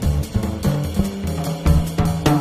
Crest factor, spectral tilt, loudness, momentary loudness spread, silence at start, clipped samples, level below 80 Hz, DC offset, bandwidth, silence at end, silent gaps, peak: 16 dB; -6.5 dB/octave; -21 LUFS; 5 LU; 0 s; under 0.1%; -26 dBFS; under 0.1%; 15.5 kHz; 0 s; none; -4 dBFS